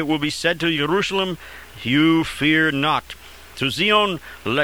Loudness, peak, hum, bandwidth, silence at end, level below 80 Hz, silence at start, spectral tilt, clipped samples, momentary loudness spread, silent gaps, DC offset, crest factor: -19 LUFS; -4 dBFS; none; over 20 kHz; 0 s; -48 dBFS; 0 s; -4.5 dB/octave; under 0.1%; 16 LU; none; 0.3%; 16 dB